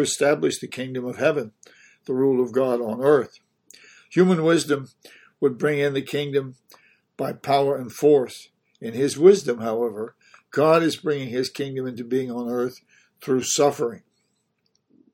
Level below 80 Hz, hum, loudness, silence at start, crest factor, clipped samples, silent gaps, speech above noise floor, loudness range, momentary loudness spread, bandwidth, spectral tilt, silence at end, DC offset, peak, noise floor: -70 dBFS; none; -22 LUFS; 0 s; 20 dB; under 0.1%; none; 50 dB; 4 LU; 13 LU; 17 kHz; -5 dB/octave; 1.15 s; under 0.1%; -2 dBFS; -71 dBFS